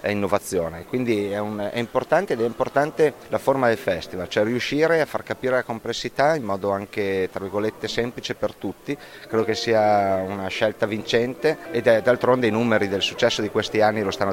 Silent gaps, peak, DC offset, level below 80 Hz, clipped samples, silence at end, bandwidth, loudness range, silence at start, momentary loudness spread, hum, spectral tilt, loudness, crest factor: none; -2 dBFS; under 0.1%; -54 dBFS; under 0.1%; 0 s; 16.5 kHz; 4 LU; 0 s; 8 LU; none; -5 dB/octave; -23 LUFS; 20 dB